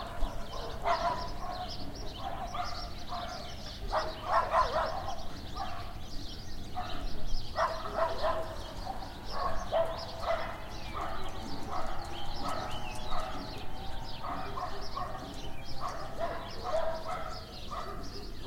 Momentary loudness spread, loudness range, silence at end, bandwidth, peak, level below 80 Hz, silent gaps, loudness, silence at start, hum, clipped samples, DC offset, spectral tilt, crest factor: 11 LU; 5 LU; 0 s; 15.5 kHz; -14 dBFS; -42 dBFS; none; -37 LUFS; 0 s; none; under 0.1%; under 0.1%; -4.5 dB/octave; 18 dB